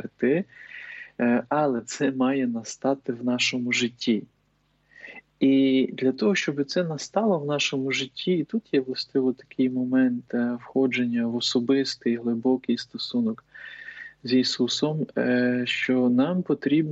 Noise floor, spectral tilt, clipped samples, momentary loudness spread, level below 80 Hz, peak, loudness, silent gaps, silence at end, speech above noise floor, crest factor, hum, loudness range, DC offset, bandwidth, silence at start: -68 dBFS; -5 dB/octave; under 0.1%; 7 LU; -72 dBFS; -10 dBFS; -25 LUFS; none; 0 s; 43 dB; 14 dB; none; 2 LU; under 0.1%; 8 kHz; 0 s